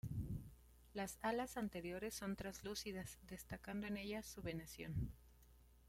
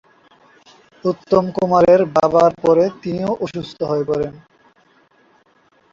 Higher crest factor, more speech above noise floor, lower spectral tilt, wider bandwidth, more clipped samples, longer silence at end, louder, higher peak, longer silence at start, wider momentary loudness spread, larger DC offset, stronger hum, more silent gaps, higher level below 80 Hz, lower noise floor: about the same, 20 dB vs 16 dB; second, 20 dB vs 40 dB; second, -5 dB/octave vs -7.5 dB/octave; first, 16.5 kHz vs 7.4 kHz; neither; second, 0 s vs 1.55 s; second, -48 LUFS vs -17 LUFS; second, -28 dBFS vs -2 dBFS; second, 0.05 s vs 1.05 s; about the same, 10 LU vs 12 LU; neither; neither; neither; second, -60 dBFS vs -54 dBFS; first, -67 dBFS vs -57 dBFS